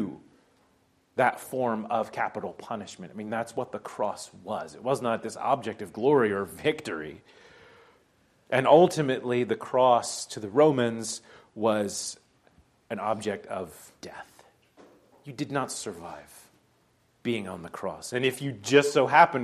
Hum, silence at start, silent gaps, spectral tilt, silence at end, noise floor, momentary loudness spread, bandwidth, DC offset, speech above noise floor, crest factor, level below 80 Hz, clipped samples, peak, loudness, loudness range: none; 0 s; none; -4.5 dB/octave; 0 s; -67 dBFS; 18 LU; 14 kHz; under 0.1%; 40 dB; 24 dB; -72 dBFS; under 0.1%; -4 dBFS; -27 LUFS; 12 LU